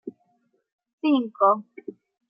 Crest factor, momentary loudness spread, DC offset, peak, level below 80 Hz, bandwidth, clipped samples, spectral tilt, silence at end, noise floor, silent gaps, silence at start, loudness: 20 dB; 22 LU; under 0.1%; -6 dBFS; -88 dBFS; 5.2 kHz; under 0.1%; -9 dB/octave; 0.4 s; -70 dBFS; 0.73-0.78 s, 0.93-0.98 s; 0.05 s; -23 LUFS